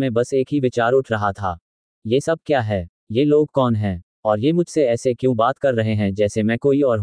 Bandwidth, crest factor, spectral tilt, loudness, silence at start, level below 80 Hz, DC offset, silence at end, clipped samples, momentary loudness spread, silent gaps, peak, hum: 10.5 kHz; 16 dB; -7 dB/octave; -19 LUFS; 0 s; -52 dBFS; under 0.1%; 0 s; under 0.1%; 8 LU; 1.61-2.02 s, 2.89-3.07 s, 4.03-4.23 s; -4 dBFS; none